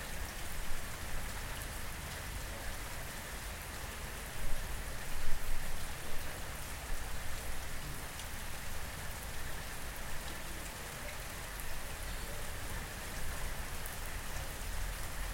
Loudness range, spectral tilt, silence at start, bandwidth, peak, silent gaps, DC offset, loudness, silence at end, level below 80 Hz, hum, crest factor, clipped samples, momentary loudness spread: 1 LU; -3 dB/octave; 0 s; 16.5 kHz; -16 dBFS; none; under 0.1%; -43 LUFS; 0 s; -42 dBFS; none; 20 dB; under 0.1%; 1 LU